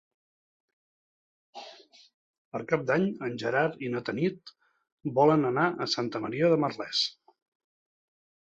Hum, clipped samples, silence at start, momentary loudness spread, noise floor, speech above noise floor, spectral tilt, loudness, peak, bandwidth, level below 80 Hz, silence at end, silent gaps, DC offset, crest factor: none; under 0.1%; 1.55 s; 17 LU; -52 dBFS; 25 dB; -5.5 dB/octave; -28 LUFS; -10 dBFS; 8.2 kHz; -72 dBFS; 1.45 s; 2.14-2.52 s, 4.92-4.98 s; under 0.1%; 22 dB